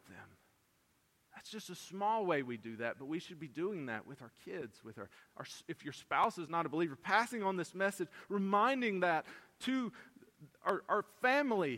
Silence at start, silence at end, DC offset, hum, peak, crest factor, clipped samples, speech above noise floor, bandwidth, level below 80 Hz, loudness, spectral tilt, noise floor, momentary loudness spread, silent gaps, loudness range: 0.1 s; 0 s; under 0.1%; none; -16 dBFS; 22 dB; under 0.1%; 38 dB; 16.5 kHz; -82 dBFS; -37 LUFS; -5 dB/octave; -75 dBFS; 19 LU; none; 8 LU